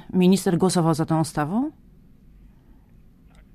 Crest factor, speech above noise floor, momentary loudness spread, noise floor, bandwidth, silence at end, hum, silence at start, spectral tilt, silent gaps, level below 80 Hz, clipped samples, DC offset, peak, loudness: 16 dB; 31 dB; 7 LU; -51 dBFS; 15 kHz; 1.85 s; none; 0.1 s; -6.5 dB/octave; none; -52 dBFS; under 0.1%; under 0.1%; -8 dBFS; -22 LUFS